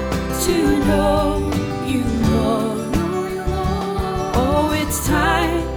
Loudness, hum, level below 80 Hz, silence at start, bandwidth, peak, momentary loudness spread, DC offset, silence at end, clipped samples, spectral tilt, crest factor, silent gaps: -19 LUFS; none; -28 dBFS; 0 s; over 20 kHz; -4 dBFS; 6 LU; under 0.1%; 0 s; under 0.1%; -5.5 dB/octave; 14 dB; none